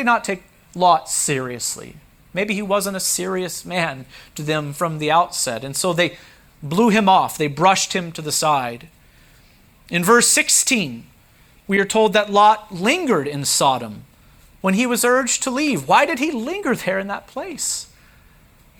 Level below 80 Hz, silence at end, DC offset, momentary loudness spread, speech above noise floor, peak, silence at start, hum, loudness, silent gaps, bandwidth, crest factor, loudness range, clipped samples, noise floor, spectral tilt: -56 dBFS; 0.95 s; under 0.1%; 13 LU; 33 dB; -2 dBFS; 0 s; none; -18 LUFS; none; over 20 kHz; 18 dB; 5 LU; under 0.1%; -51 dBFS; -3 dB/octave